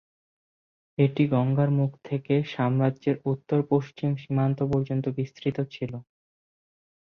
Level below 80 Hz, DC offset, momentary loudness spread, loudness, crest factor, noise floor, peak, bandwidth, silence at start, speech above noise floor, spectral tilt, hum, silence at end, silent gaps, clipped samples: -60 dBFS; under 0.1%; 9 LU; -26 LUFS; 18 dB; under -90 dBFS; -8 dBFS; 6.2 kHz; 1 s; over 65 dB; -9.5 dB/octave; none; 1.15 s; none; under 0.1%